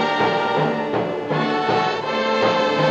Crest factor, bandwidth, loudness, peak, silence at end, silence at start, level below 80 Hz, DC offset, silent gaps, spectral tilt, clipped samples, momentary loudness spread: 14 dB; 8.4 kHz; -20 LUFS; -6 dBFS; 0 s; 0 s; -60 dBFS; under 0.1%; none; -5.5 dB/octave; under 0.1%; 5 LU